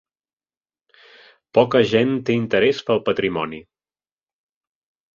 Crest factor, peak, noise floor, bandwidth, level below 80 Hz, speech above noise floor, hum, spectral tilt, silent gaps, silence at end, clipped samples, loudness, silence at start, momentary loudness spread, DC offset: 20 dB; -2 dBFS; under -90 dBFS; 7.4 kHz; -58 dBFS; over 71 dB; none; -6.5 dB/octave; none; 1.5 s; under 0.1%; -19 LUFS; 1.55 s; 10 LU; under 0.1%